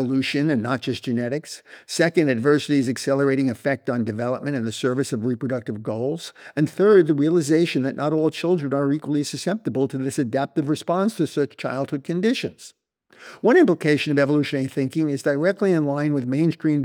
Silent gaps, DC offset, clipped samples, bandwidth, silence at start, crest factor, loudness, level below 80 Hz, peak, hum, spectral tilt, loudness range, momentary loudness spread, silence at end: none; under 0.1%; under 0.1%; 16.5 kHz; 0 s; 16 dB; -22 LUFS; -74 dBFS; -4 dBFS; none; -6 dB/octave; 4 LU; 8 LU; 0 s